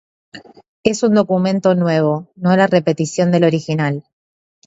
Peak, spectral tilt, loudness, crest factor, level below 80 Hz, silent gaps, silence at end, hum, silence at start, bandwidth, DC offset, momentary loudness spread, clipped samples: 0 dBFS; -6.5 dB/octave; -16 LUFS; 16 dB; -56 dBFS; 0.68-0.84 s; 0.65 s; none; 0.35 s; 8 kHz; under 0.1%; 6 LU; under 0.1%